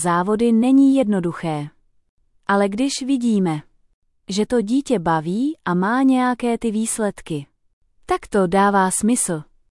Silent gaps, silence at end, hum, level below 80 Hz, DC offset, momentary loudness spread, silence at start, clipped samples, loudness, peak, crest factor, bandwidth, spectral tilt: 2.09-2.17 s, 3.94-4.02 s, 7.73-7.81 s; 0.3 s; none; -52 dBFS; under 0.1%; 11 LU; 0 s; under 0.1%; -19 LUFS; -6 dBFS; 14 dB; 12 kHz; -5 dB/octave